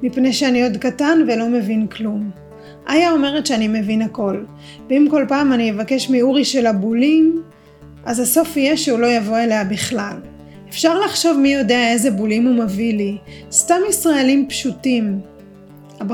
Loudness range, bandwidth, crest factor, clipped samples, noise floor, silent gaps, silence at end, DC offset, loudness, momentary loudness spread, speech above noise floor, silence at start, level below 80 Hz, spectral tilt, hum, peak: 2 LU; 18.5 kHz; 16 dB; under 0.1%; -41 dBFS; none; 0 s; under 0.1%; -16 LUFS; 10 LU; 25 dB; 0 s; -50 dBFS; -4 dB/octave; none; 0 dBFS